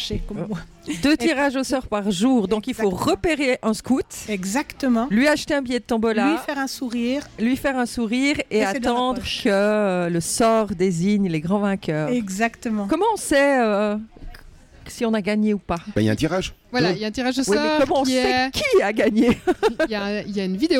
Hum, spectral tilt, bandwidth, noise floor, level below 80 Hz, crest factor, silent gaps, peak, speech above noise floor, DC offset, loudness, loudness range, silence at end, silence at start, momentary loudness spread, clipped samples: none; -5 dB/octave; 17 kHz; -45 dBFS; -44 dBFS; 14 dB; none; -8 dBFS; 24 dB; under 0.1%; -21 LUFS; 3 LU; 0 s; 0 s; 7 LU; under 0.1%